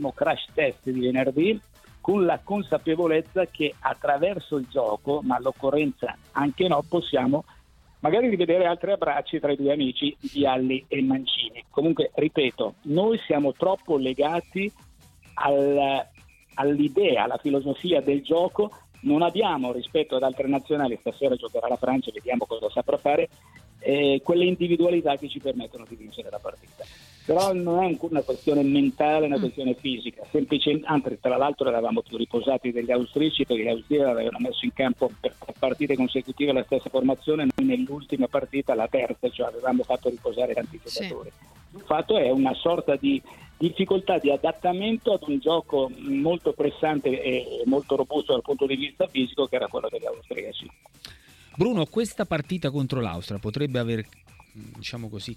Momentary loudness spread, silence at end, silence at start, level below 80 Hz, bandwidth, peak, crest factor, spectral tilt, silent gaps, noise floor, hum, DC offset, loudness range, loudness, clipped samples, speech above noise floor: 10 LU; 0 s; 0 s; -56 dBFS; 14 kHz; -6 dBFS; 18 dB; -6.5 dB/octave; none; -55 dBFS; none; under 0.1%; 4 LU; -25 LUFS; under 0.1%; 30 dB